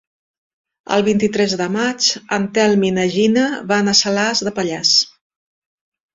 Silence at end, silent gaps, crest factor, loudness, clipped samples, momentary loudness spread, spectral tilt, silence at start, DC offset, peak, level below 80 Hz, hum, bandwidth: 1.05 s; none; 18 dB; -16 LUFS; under 0.1%; 6 LU; -3.5 dB/octave; 0.9 s; under 0.1%; 0 dBFS; -56 dBFS; none; 7.8 kHz